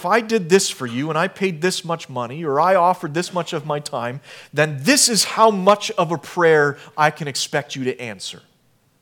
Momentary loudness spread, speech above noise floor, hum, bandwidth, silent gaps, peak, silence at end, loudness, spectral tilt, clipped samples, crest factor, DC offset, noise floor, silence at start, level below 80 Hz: 12 LU; 41 dB; none; 19 kHz; none; 0 dBFS; 0.65 s; -19 LUFS; -3.5 dB/octave; under 0.1%; 20 dB; under 0.1%; -60 dBFS; 0 s; -72 dBFS